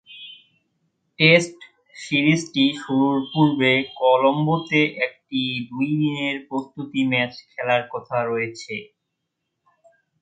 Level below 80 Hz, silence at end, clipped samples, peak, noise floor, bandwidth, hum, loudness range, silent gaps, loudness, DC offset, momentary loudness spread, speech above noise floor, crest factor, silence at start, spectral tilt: -66 dBFS; 1.35 s; under 0.1%; 0 dBFS; -78 dBFS; 9.2 kHz; none; 6 LU; none; -21 LUFS; under 0.1%; 13 LU; 58 dB; 22 dB; 0.1 s; -5.5 dB/octave